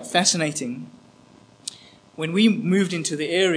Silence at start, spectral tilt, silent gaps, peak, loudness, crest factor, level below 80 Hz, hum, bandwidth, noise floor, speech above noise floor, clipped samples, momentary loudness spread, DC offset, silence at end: 0 s; -3.5 dB/octave; none; -2 dBFS; -22 LUFS; 20 dB; -72 dBFS; none; 10.5 kHz; -52 dBFS; 30 dB; under 0.1%; 17 LU; under 0.1%; 0 s